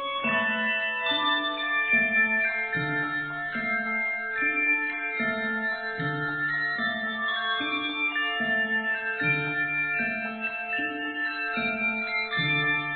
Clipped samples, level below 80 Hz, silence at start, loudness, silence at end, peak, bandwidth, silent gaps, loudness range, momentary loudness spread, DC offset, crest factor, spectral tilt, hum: under 0.1%; -66 dBFS; 0 s; -26 LUFS; 0 s; -12 dBFS; 4.7 kHz; none; 3 LU; 6 LU; under 0.1%; 14 dB; -7.5 dB/octave; none